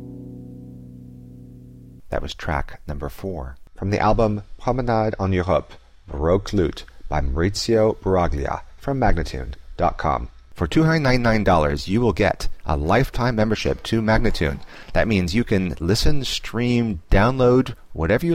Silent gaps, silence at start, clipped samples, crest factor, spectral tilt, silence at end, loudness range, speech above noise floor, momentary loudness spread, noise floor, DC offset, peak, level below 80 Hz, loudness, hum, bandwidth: none; 0 s; under 0.1%; 14 dB; -6.5 dB/octave; 0 s; 5 LU; 22 dB; 17 LU; -42 dBFS; under 0.1%; -6 dBFS; -30 dBFS; -21 LUFS; none; 15.5 kHz